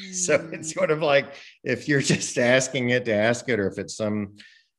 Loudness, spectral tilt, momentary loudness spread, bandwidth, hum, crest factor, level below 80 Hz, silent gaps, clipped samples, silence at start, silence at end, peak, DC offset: -23 LUFS; -4 dB/octave; 11 LU; 12.5 kHz; none; 18 dB; -66 dBFS; none; under 0.1%; 0 s; 0.5 s; -6 dBFS; under 0.1%